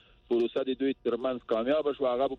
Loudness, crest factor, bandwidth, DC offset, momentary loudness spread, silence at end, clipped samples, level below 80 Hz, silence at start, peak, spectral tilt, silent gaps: -30 LUFS; 14 dB; 6 kHz; under 0.1%; 3 LU; 0 s; under 0.1%; -62 dBFS; 0.3 s; -16 dBFS; -7 dB/octave; none